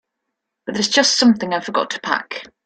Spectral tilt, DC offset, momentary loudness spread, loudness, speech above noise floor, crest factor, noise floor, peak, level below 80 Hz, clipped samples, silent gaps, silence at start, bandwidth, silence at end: -2.5 dB/octave; under 0.1%; 15 LU; -17 LUFS; 60 dB; 18 dB; -78 dBFS; -2 dBFS; -64 dBFS; under 0.1%; none; 0.65 s; 9.4 kHz; 0.2 s